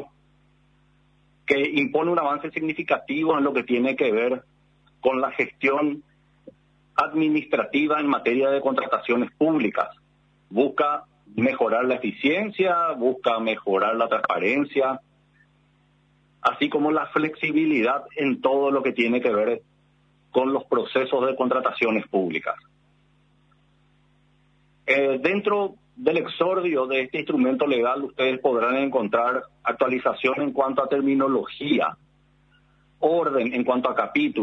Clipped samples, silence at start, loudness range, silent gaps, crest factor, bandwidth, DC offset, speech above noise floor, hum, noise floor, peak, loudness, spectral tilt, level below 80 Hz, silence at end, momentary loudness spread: under 0.1%; 0 s; 3 LU; none; 18 dB; 7.2 kHz; under 0.1%; 39 dB; none; -61 dBFS; -6 dBFS; -23 LUFS; -7 dB/octave; -68 dBFS; 0 s; 5 LU